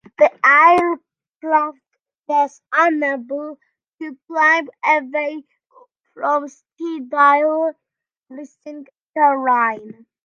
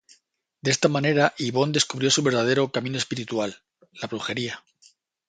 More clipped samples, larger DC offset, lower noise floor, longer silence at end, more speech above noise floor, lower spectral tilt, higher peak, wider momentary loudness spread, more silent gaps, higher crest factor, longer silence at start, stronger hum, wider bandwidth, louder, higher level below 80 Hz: neither; neither; first, -73 dBFS vs -66 dBFS; second, 0.35 s vs 0.7 s; first, 54 dB vs 43 dB; about the same, -4 dB/octave vs -4 dB/octave; about the same, -2 dBFS vs -4 dBFS; first, 22 LU vs 12 LU; first, 1.36-1.41 s, 2.18-2.24 s, 4.24-4.28 s, 6.00-6.04 s, 8.17-8.22 s, 9.03-9.13 s vs none; about the same, 18 dB vs 22 dB; second, 0.2 s vs 0.65 s; neither; about the same, 8.8 kHz vs 9.6 kHz; first, -17 LUFS vs -24 LUFS; about the same, -70 dBFS vs -66 dBFS